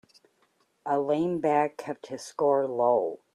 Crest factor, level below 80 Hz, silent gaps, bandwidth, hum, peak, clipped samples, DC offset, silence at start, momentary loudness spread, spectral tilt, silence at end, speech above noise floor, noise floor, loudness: 16 dB; -74 dBFS; none; 12 kHz; none; -10 dBFS; under 0.1%; under 0.1%; 0.85 s; 13 LU; -6.5 dB/octave; 0.2 s; 43 dB; -69 dBFS; -27 LUFS